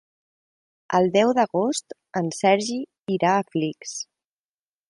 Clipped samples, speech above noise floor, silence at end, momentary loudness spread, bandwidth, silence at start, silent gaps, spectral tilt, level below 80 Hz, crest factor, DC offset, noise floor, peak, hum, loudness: under 0.1%; over 68 dB; 0.85 s; 13 LU; 11.5 kHz; 0.9 s; 3.00-3.05 s; -4.5 dB/octave; -70 dBFS; 20 dB; under 0.1%; under -90 dBFS; -4 dBFS; none; -23 LUFS